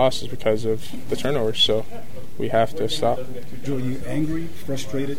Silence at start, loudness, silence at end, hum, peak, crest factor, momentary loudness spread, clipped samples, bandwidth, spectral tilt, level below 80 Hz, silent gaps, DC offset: 0 s; -24 LUFS; 0 s; none; -6 dBFS; 18 dB; 13 LU; under 0.1%; 16.5 kHz; -5 dB/octave; -46 dBFS; none; 8%